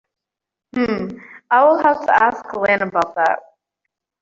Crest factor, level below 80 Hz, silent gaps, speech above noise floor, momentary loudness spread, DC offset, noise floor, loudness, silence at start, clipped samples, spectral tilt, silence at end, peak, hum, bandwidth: 16 dB; -58 dBFS; none; 69 dB; 13 LU; under 0.1%; -85 dBFS; -17 LUFS; 0.75 s; under 0.1%; -6 dB/octave; 0.85 s; -2 dBFS; none; 7.6 kHz